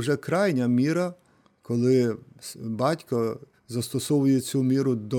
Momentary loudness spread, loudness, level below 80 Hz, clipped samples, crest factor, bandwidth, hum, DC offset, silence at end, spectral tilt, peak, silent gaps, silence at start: 12 LU; -25 LUFS; -70 dBFS; under 0.1%; 14 dB; 18 kHz; none; under 0.1%; 0 s; -6.5 dB/octave; -10 dBFS; none; 0 s